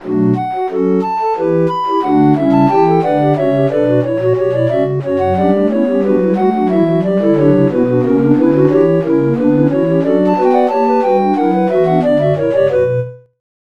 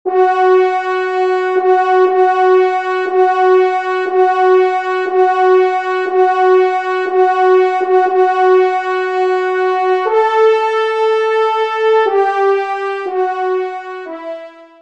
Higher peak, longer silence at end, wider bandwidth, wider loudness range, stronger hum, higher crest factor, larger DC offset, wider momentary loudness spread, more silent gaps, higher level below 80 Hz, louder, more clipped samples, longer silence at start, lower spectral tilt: about the same, 0 dBFS vs -2 dBFS; first, 0.5 s vs 0.2 s; about the same, 7 kHz vs 7.4 kHz; about the same, 2 LU vs 2 LU; neither; about the same, 12 dB vs 12 dB; first, 0.7% vs 0.2%; second, 4 LU vs 7 LU; neither; first, -52 dBFS vs -70 dBFS; about the same, -13 LUFS vs -13 LUFS; neither; about the same, 0 s vs 0.05 s; first, -9.5 dB/octave vs -3 dB/octave